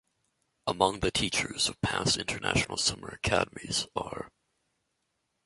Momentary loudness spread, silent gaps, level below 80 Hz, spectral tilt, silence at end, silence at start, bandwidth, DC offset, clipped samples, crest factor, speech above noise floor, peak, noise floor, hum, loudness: 9 LU; none; -50 dBFS; -3 dB/octave; 1.2 s; 0.65 s; 11.5 kHz; under 0.1%; under 0.1%; 24 dB; 49 dB; -8 dBFS; -79 dBFS; none; -29 LUFS